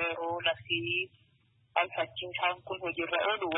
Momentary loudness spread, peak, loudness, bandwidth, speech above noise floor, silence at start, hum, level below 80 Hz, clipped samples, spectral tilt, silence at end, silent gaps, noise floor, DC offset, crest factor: 6 LU; -12 dBFS; -32 LUFS; 3.9 kHz; 35 dB; 0 s; none; -70 dBFS; under 0.1%; 1 dB/octave; 0 s; none; -68 dBFS; under 0.1%; 22 dB